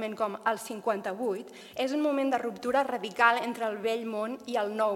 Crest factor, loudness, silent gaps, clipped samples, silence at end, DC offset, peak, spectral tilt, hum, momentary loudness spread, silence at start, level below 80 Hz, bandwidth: 20 dB; -30 LUFS; none; under 0.1%; 0 s; under 0.1%; -8 dBFS; -4 dB/octave; none; 9 LU; 0 s; -76 dBFS; 16.5 kHz